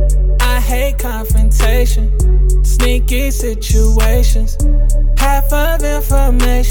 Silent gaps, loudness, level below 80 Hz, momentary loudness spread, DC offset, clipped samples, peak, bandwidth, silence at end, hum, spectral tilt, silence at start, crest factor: none; -14 LUFS; -10 dBFS; 4 LU; under 0.1%; under 0.1%; 0 dBFS; 18 kHz; 0 s; none; -5 dB/octave; 0 s; 10 dB